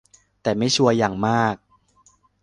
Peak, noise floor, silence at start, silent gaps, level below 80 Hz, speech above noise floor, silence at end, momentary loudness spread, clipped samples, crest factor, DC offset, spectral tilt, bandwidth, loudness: -2 dBFS; -59 dBFS; 0.45 s; none; -56 dBFS; 39 dB; 0.85 s; 10 LU; under 0.1%; 20 dB; under 0.1%; -4.5 dB/octave; 11 kHz; -20 LUFS